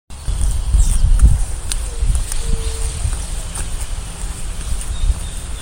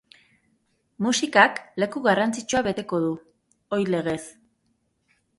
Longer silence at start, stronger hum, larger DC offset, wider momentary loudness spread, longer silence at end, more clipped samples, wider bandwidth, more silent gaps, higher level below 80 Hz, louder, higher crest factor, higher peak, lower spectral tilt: second, 0.1 s vs 1 s; neither; neither; about the same, 12 LU vs 12 LU; second, 0 s vs 1.1 s; neither; first, 16.5 kHz vs 11.5 kHz; neither; first, -18 dBFS vs -62 dBFS; about the same, -21 LUFS vs -23 LUFS; second, 16 dB vs 24 dB; about the same, 0 dBFS vs 0 dBFS; about the same, -4 dB/octave vs -4 dB/octave